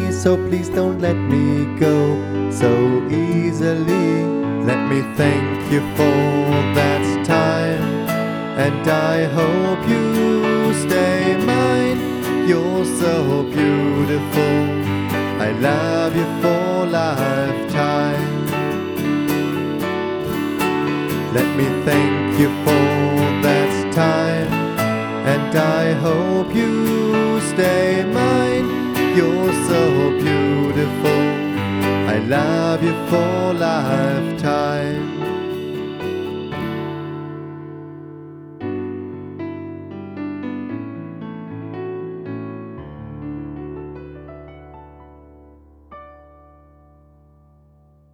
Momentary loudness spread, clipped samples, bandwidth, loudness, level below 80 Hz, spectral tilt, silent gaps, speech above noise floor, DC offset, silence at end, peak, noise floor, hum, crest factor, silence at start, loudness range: 14 LU; under 0.1%; over 20 kHz; -18 LUFS; -50 dBFS; -6.5 dB/octave; none; 35 dB; under 0.1%; 2 s; -2 dBFS; -52 dBFS; none; 16 dB; 0 s; 13 LU